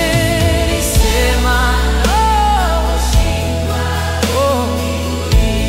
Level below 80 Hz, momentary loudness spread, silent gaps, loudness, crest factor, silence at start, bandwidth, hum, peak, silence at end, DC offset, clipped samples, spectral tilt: -18 dBFS; 5 LU; none; -14 LUFS; 12 dB; 0 s; 16 kHz; none; -2 dBFS; 0 s; under 0.1%; under 0.1%; -4.5 dB/octave